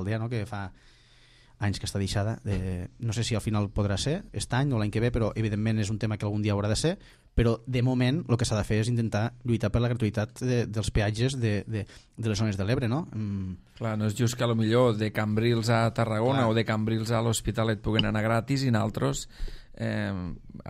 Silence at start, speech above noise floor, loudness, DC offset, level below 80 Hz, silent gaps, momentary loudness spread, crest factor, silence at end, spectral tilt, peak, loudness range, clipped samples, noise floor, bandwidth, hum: 0 s; 30 dB; -28 LUFS; under 0.1%; -42 dBFS; none; 9 LU; 18 dB; 0 s; -6 dB/octave; -8 dBFS; 4 LU; under 0.1%; -57 dBFS; 14 kHz; none